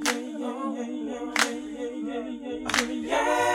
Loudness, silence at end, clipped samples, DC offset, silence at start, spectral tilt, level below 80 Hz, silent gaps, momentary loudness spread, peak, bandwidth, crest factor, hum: -28 LUFS; 0 s; under 0.1%; under 0.1%; 0 s; -2 dB/octave; -58 dBFS; none; 9 LU; -8 dBFS; 17 kHz; 22 dB; none